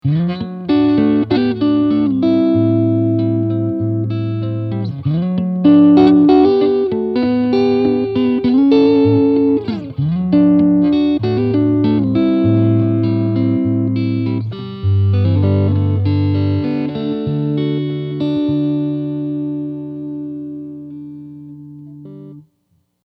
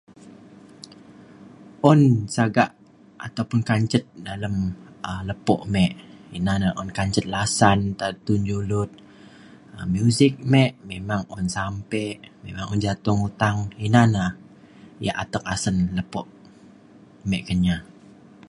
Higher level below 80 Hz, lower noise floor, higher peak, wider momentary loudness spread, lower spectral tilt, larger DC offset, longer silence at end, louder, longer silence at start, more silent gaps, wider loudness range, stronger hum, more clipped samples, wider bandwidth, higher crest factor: about the same, -48 dBFS vs -44 dBFS; first, -62 dBFS vs -49 dBFS; about the same, 0 dBFS vs -2 dBFS; about the same, 15 LU vs 16 LU; first, -10.5 dB/octave vs -6 dB/octave; neither; about the same, 0.65 s vs 0.65 s; first, -15 LUFS vs -23 LUFS; second, 0.05 s vs 0.25 s; neither; first, 9 LU vs 4 LU; neither; neither; second, 5.4 kHz vs 11.5 kHz; second, 14 dB vs 22 dB